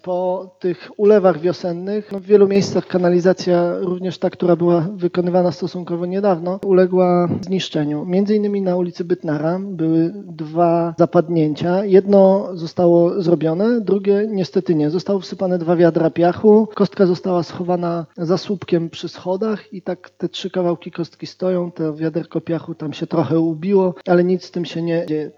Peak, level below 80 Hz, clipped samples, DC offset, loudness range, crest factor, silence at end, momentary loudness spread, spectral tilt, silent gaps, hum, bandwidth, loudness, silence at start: 0 dBFS; -64 dBFS; under 0.1%; under 0.1%; 7 LU; 16 dB; 0.1 s; 11 LU; -8 dB/octave; none; none; 7.4 kHz; -18 LUFS; 0.05 s